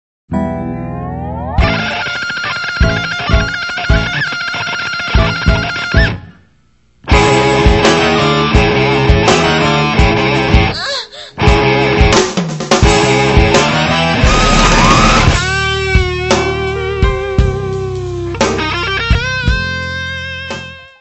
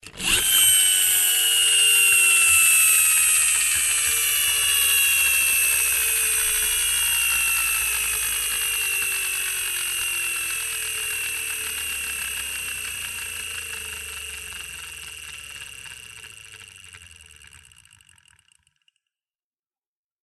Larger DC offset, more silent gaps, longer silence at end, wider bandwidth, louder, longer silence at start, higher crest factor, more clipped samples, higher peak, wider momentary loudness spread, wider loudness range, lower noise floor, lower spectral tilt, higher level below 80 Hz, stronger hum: first, 0.2% vs under 0.1%; neither; second, 0.15 s vs 3 s; second, 8.4 kHz vs 12.5 kHz; first, -12 LUFS vs -18 LUFS; first, 0.3 s vs 0.05 s; second, 12 dB vs 18 dB; first, 0.1% vs under 0.1%; first, 0 dBFS vs -4 dBFS; second, 11 LU vs 19 LU; second, 6 LU vs 19 LU; second, -53 dBFS vs under -90 dBFS; first, -4.5 dB/octave vs 2.5 dB/octave; first, -18 dBFS vs -50 dBFS; neither